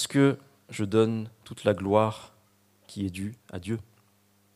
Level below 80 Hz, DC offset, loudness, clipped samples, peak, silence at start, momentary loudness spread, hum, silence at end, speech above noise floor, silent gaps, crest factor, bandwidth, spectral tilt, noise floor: -66 dBFS; under 0.1%; -28 LUFS; under 0.1%; -6 dBFS; 0 s; 17 LU; none; 0.75 s; 38 dB; none; 22 dB; 15 kHz; -6 dB/octave; -65 dBFS